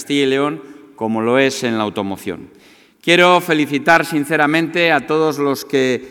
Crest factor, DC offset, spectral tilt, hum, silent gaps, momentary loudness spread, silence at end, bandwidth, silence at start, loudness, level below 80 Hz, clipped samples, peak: 16 dB; under 0.1%; -4.5 dB/octave; none; none; 12 LU; 0 s; 18.5 kHz; 0 s; -15 LUFS; -62 dBFS; under 0.1%; 0 dBFS